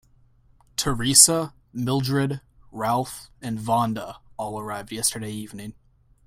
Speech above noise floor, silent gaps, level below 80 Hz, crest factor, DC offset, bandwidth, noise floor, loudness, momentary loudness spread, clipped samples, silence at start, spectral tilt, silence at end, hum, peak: 34 dB; none; -50 dBFS; 26 dB; under 0.1%; 16 kHz; -57 dBFS; -22 LUFS; 21 LU; under 0.1%; 0.8 s; -3 dB/octave; 0.55 s; none; 0 dBFS